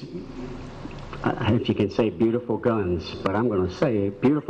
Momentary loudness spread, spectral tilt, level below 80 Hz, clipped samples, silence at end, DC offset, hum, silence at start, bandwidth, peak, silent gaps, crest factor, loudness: 14 LU; -8 dB/octave; -46 dBFS; under 0.1%; 0 s; under 0.1%; none; 0 s; 8.4 kHz; -10 dBFS; none; 14 dB; -24 LUFS